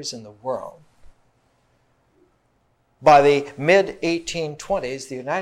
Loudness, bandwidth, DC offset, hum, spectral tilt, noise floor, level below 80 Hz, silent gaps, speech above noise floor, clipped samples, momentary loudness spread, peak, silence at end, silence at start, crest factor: -20 LUFS; 12.5 kHz; under 0.1%; none; -4.5 dB/octave; -65 dBFS; -54 dBFS; none; 45 dB; under 0.1%; 17 LU; -2 dBFS; 0 s; 0 s; 20 dB